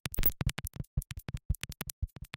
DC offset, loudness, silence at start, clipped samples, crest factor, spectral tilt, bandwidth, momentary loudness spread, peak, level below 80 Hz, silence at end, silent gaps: under 0.1%; -36 LUFS; 0.05 s; under 0.1%; 24 dB; -4 dB/octave; 17 kHz; 14 LU; -12 dBFS; -40 dBFS; 0.1 s; 0.87-0.97 s, 1.45-1.49 s, 1.93-2.02 s